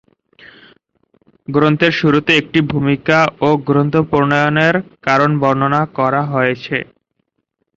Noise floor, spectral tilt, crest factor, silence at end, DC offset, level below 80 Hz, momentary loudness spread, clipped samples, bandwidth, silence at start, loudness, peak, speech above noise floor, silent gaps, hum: -70 dBFS; -7 dB/octave; 16 dB; 0.95 s; under 0.1%; -50 dBFS; 7 LU; under 0.1%; 7.8 kHz; 1.5 s; -14 LUFS; 0 dBFS; 56 dB; none; none